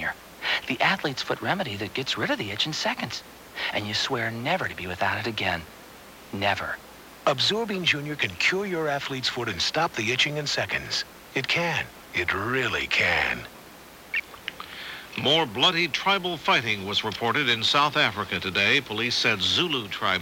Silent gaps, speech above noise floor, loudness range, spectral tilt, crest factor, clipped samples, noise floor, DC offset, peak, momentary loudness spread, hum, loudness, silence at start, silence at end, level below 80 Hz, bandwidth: none; 21 dB; 5 LU; -3 dB/octave; 20 dB; under 0.1%; -47 dBFS; under 0.1%; -8 dBFS; 11 LU; none; -25 LUFS; 0 s; 0 s; -58 dBFS; 17 kHz